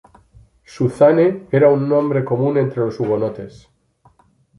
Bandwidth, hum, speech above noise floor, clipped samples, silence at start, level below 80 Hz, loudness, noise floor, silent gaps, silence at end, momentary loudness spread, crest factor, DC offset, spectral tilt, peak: 11.5 kHz; none; 40 dB; under 0.1%; 0.75 s; -56 dBFS; -17 LUFS; -56 dBFS; none; 1.1 s; 10 LU; 16 dB; under 0.1%; -9 dB/octave; -2 dBFS